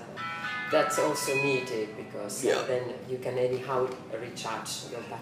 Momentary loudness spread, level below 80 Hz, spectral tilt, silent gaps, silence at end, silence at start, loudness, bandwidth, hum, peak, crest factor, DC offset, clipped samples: 10 LU; -72 dBFS; -3.5 dB/octave; none; 0 s; 0 s; -30 LUFS; 15.5 kHz; none; -12 dBFS; 20 dB; under 0.1%; under 0.1%